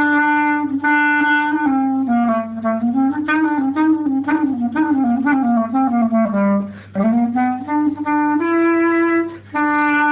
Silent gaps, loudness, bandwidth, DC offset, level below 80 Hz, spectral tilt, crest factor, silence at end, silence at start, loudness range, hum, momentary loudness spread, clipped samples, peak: none; -17 LUFS; 4 kHz; under 0.1%; -56 dBFS; -10 dB/octave; 10 dB; 0 s; 0 s; 1 LU; none; 5 LU; under 0.1%; -6 dBFS